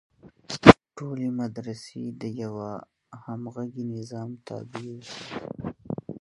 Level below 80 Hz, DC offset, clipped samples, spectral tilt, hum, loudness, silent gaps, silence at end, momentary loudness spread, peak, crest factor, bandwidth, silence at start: -50 dBFS; under 0.1%; under 0.1%; -6.5 dB/octave; none; -24 LUFS; none; 0.05 s; 22 LU; 0 dBFS; 26 dB; 11.5 kHz; 0.25 s